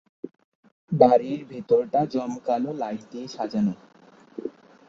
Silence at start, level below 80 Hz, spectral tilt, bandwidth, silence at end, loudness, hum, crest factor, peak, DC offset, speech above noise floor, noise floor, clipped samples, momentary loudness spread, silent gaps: 0.25 s; -68 dBFS; -8 dB/octave; 7.6 kHz; 0.4 s; -24 LUFS; none; 24 dB; -2 dBFS; under 0.1%; 30 dB; -53 dBFS; under 0.1%; 24 LU; 0.44-0.63 s, 0.72-0.88 s